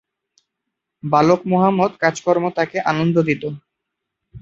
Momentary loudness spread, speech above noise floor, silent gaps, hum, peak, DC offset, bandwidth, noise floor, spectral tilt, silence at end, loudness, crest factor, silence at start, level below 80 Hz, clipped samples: 10 LU; 62 dB; none; none; -2 dBFS; under 0.1%; 7.8 kHz; -80 dBFS; -6.5 dB/octave; 0.05 s; -18 LUFS; 18 dB; 1.05 s; -58 dBFS; under 0.1%